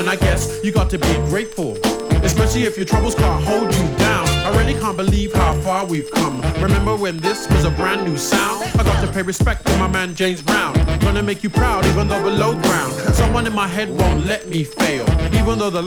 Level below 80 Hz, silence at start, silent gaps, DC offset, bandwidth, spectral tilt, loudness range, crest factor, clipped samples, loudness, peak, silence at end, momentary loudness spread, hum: -24 dBFS; 0 s; none; under 0.1%; over 20 kHz; -5 dB/octave; 1 LU; 16 dB; under 0.1%; -18 LUFS; 0 dBFS; 0 s; 4 LU; none